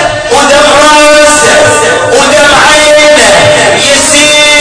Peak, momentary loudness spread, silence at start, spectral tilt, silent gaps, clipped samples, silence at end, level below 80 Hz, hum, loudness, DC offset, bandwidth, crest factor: 0 dBFS; 4 LU; 0 s; -1.5 dB/octave; none; 20%; 0 s; -30 dBFS; none; -2 LUFS; under 0.1%; 11 kHz; 4 dB